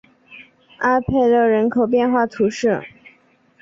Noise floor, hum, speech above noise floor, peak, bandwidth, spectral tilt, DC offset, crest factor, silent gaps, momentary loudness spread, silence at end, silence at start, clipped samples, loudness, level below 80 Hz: -56 dBFS; none; 39 dB; -4 dBFS; 7.6 kHz; -6.5 dB/octave; under 0.1%; 16 dB; none; 6 LU; 0.75 s; 0.3 s; under 0.1%; -18 LUFS; -48 dBFS